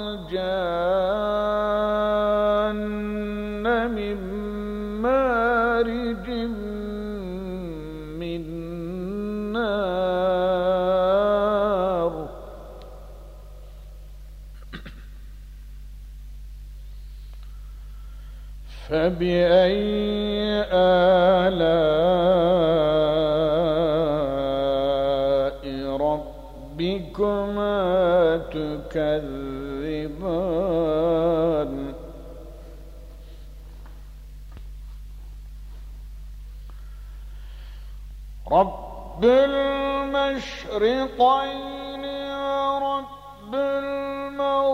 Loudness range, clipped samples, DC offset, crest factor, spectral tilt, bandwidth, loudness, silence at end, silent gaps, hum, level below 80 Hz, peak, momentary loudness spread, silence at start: 23 LU; under 0.1%; under 0.1%; 18 dB; -7 dB/octave; 15 kHz; -23 LUFS; 0 s; none; 50 Hz at -45 dBFS; -40 dBFS; -6 dBFS; 23 LU; 0 s